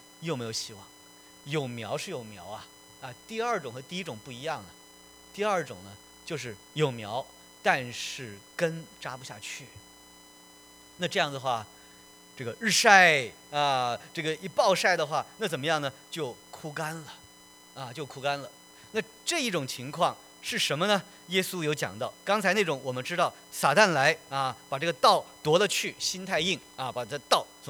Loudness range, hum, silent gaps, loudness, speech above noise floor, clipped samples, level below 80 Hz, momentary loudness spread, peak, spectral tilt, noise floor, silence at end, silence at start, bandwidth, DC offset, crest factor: 11 LU; none; none; -28 LUFS; 25 dB; under 0.1%; -70 dBFS; 18 LU; -4 dBFS; -3 dB/octave; -54 dBFS; 0 s; 0.2 s; over 20 kHz; under 0.1%; 26 dB